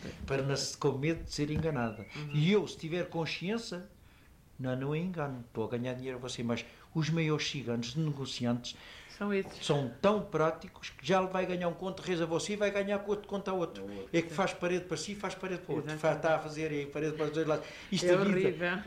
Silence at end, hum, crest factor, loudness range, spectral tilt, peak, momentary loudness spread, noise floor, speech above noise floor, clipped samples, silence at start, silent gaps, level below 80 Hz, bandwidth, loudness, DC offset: 0 s; none; 18 dB; 4 LU; -5.5 dB/octave; -14 dBFS; 9 LU; -59 dBFS; 26 dB; under 0.1%; 0 s; none; -58 dBFS; 15.5 kHz; -34 LUFS; under 0.1%